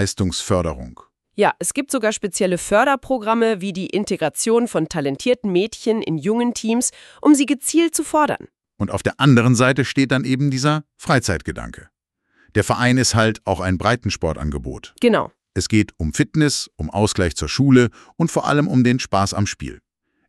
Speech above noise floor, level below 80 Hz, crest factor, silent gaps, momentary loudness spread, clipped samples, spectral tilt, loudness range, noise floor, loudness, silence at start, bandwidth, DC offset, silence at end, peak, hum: 44 dB; -40 dBFS; 16 dB; none; 10 LU; under 0.1%; -5 dB/octave; 3 LU; -62 dBFS; -19 LUFS; 0 s; 13.5 kHz; under 0.1%; 0.5 s; -2 dBFS; none